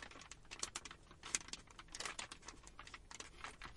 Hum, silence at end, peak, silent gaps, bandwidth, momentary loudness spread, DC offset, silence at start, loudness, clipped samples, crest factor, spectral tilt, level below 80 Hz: none; 0 s; -14 dBFS; none; 11.5 kHz; 13 LU; under 0.1%; 0 s; -49 LUFS; under 0.1%; 38 dB; -0.5 dB/octave; -64 dBFS